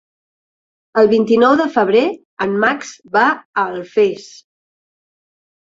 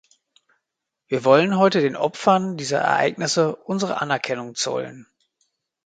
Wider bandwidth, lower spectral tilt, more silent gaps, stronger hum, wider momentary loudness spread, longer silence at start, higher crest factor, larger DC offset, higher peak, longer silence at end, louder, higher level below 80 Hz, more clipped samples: second, 7.8 kHz vs 9.4 kHz; about the same, -5 dB/octave vs -4.5 dB/octave; first, 2.25-2.37 s, 3.45-3.54 s vs none; neither; about the same, 10 LU vs 9 LU; second, 0.95 s vs 1.1 s; about the same, 16 dB vs 20 dB; neither; about the same, -2 dBFS vs -2 dBFS; first, 1.35 s vs 0.85 s; first, -15 LUFS vs -21 LUFS; first, -60 dBFS vs -68 dBFS; neither